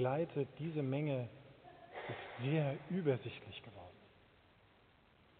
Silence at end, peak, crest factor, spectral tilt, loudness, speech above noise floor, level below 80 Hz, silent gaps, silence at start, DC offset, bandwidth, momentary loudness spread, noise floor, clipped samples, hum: 1.35 s; -22 dBFS; 20 dB; -6.5 dB/octave; -40 LUFS; 29 dB; -76 dBFS; none; 0 s; under 0.1%; 4.5 kHz; 20 LU; -68 dBFS; under 0.1%; none